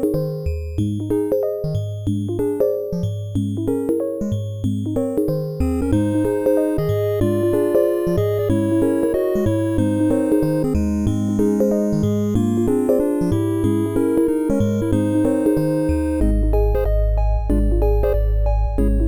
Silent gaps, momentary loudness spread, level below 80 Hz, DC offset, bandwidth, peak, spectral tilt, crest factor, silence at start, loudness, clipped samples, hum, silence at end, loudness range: none; 6 LU; -26 dBFS; under 0.1%; 19 kHz; -4 dBFS; -8.5 dB/octave; 14 dB; 0 s; -20 LUFS; under 0.1%; none; 0 s; 4 LU